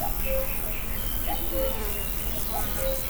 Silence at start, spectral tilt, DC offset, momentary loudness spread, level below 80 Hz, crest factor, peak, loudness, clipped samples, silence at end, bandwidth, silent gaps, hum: 0 s; -4 dB/octave; under 0.1%; 2 LU; -32 dBFS; 16 dB; -12 dBFS; -27 LUFS; under 0.1%; 0 s; over 20 kHz; none; none